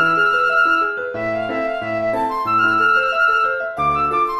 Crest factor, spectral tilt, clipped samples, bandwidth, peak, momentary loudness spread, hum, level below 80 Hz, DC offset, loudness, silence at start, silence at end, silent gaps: 12 dB; -5 dB/octave; under 0.1%; 13 kHz; -6 dBFS; 8 LU; none; -48 dBFS; under 0.1%; -17 LUFS; 0 s; 0 s; none